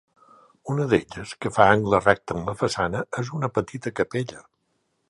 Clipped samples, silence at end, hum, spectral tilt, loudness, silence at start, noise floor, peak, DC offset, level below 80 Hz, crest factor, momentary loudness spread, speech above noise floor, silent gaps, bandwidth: under 0.1%; 0.7 s; none; -6 dB/octave; -23 LUFS; 0.65 s; -72 dBFS; 0 dBFS; under 0.1%; -52 dBFS; 24 dB; 13 LU; 49 dB; none; 11.5 kHz